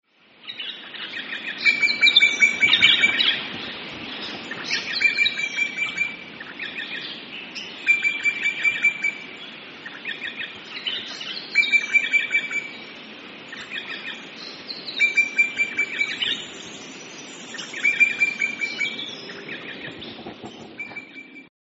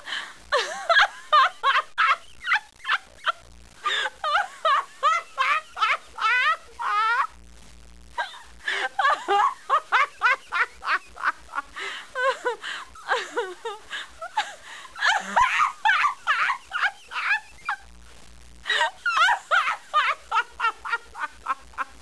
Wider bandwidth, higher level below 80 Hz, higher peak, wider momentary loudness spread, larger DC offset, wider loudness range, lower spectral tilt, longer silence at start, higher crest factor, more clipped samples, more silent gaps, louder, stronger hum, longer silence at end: second, 8 kHz vs 11 kHz; second, -68 dBFS vs -58 dBFS; first, -2 dBFS vs -8 dBFS; first, 21 LU vs 13 LU; second, under 0.1% vs 0.3%; about the same, 7 LU vs 5 LU; second, 2 dB/octave vs 0 dB/octave; first, 0.45 s vs 0.05 s; first, 24 dB vs 18 dB; neither; neither; first, -20 LUFS vs -24 LUFS; neither; about the same, 0.25 s vs 0.15 s